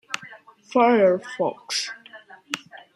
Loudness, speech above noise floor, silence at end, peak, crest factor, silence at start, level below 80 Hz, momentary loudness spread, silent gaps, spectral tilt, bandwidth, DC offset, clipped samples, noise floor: -23 LUFS; 26 dB; 0.15 s; -4 dBFS; 20 dB; 0.1 s; -76 dBFS; 16 LU; none; -3.5 dB/octave; 14 kHz; under 0.1%; under 0.1%; -47 dBFS